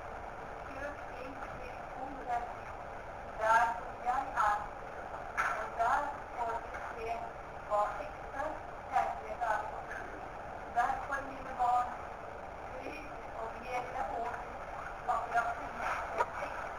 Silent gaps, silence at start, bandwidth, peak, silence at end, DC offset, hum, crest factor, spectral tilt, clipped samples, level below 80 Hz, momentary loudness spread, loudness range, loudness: none; 0 s; 19 kHz; -16 dBFS; 0 s; under 0.1%; none; 22 dB; -4.5 dB/octave; under 0.1%; -54 dBFS; 12 LU; 4 LU; -37 LUFS